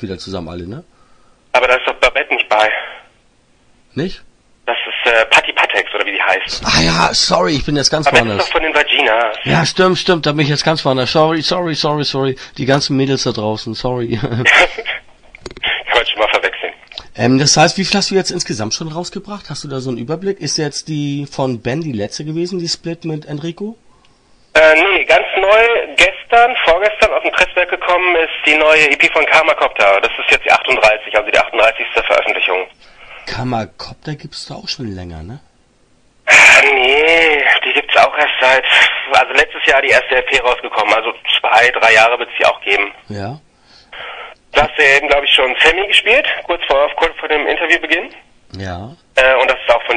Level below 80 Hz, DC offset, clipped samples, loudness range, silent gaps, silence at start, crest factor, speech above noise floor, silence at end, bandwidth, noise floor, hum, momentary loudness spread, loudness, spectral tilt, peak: -40 dBFS; under 0.1%; 0.1%; 10 LU; none; 0 s; 14 dB; 39 dB; 0 s; 12 kHz; -53 dBFS; none; 17 LU; -12 LUFS; -3.5 dB/octave; 0 dBFS